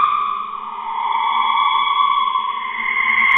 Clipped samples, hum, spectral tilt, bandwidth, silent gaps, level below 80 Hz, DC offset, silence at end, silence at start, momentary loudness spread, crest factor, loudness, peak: under 0.1%; none; -2.5 dB/octave; 4 kHz; none; -62 dBFS; under 0.1%; 0 s; 0 s; 10 LU; 16 dB; -18 LUFS; -2 dBFS